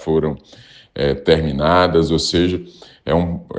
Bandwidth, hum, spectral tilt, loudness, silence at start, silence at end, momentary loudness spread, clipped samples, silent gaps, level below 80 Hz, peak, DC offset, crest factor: 9.6 kHz; none; -6 dB/octave; -17 LUFS; 0 s; 0 s; 14 LU; under 0.1%; none; -38 dBFS; 0 dBFS; under 0.1%; 18 dB